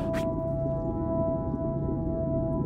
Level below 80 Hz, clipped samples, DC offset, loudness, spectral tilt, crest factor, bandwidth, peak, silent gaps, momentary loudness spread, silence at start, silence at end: -40 dBFS; under 0.1%; under 0.1%; -30 LUFS; -9.5 dB/octave; 12 dB; 10 kHz; -16 dBFS; none; 2 LU; 0 s; 0 s